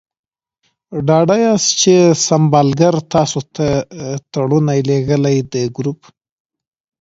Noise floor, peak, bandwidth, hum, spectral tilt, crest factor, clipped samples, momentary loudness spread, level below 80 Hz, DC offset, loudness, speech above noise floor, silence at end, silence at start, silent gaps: -66 dBFS; 0 dBFS; 7.8 kHz; none; -5 dB/octave; 14 dB; under 0.1%; 12 LU; -48 dBFS; under 0.1%; -14 LUFS; 53 dB; 1.05 s; 0.9 s; none